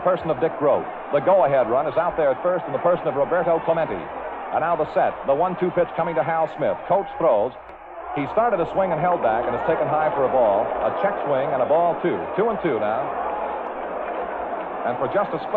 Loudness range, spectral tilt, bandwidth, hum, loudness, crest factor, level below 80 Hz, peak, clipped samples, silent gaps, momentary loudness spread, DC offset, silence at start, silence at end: 2 LU; -9 dB/octave; 4.5 kHz; none; -22 LUFS; 14 dB; -54 dBFS; -8 dBFS; under 0.1%; none; 9 LU; under 0.1%; 0 s; 0 s